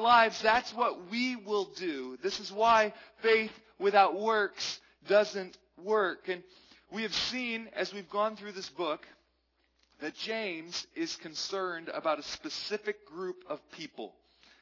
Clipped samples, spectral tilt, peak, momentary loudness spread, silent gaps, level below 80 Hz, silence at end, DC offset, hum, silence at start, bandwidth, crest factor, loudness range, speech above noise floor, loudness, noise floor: under 0.1%; -3 dB/octave; -8 dBFS; 16 LU; none; -70 dBFS; 0.55 s; under 0.1%; none; 0 s; 6 kHz; 24 dB; 9 LU; 43 dB; -31 LUFS; -75 dBFS